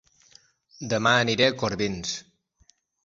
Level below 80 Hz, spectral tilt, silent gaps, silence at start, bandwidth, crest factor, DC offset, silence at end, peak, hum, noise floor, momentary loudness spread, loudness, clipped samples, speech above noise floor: -56 dBFS; -3.5 dB/octave; none; 0.8 s; 7.8 kHz; 22 dB; under 0.1%; 0.85 s; -6 dBFS; none; -64 dBFS; 13 LU; -24 LUFS; under 0.1%; 39 dB